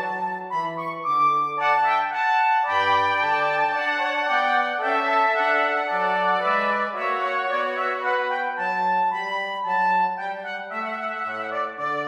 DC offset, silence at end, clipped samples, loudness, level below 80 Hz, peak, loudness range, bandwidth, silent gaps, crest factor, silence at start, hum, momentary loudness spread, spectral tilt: under 0.1%; 0 s; under 0.1%; -22 LUFS; -80 dBFS; -10 dBFS; 3 LU; 9.4 kHz; none; 14 dB; 0 s; none; 8 LU; -4 dB/octave